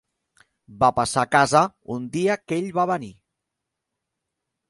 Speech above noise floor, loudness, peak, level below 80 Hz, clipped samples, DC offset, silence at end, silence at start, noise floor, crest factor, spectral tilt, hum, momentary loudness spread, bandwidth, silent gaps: 61 dB; -22 LUFS; -2 dBFS; -58 dBFS; under 0.1%; under 0.1%; 1.6 s; 0.7 s; -83 dBFS; 22 dB; -4.5 dB/octave; none; 11 LU; 11.5 kHz; none